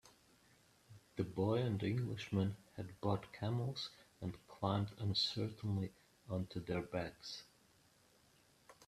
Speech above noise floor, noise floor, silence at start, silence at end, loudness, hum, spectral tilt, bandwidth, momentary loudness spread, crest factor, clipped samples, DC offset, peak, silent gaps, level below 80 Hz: 31 dB; -71 dBFS; 0.05 s; 0.05 s; -41 LUFS; none; -6.5 dB/octave; 13.5 kHz; 12 LU; 20 dB; under 0.1%; under 0.1%; -22 dBFS; none; -70 dBFS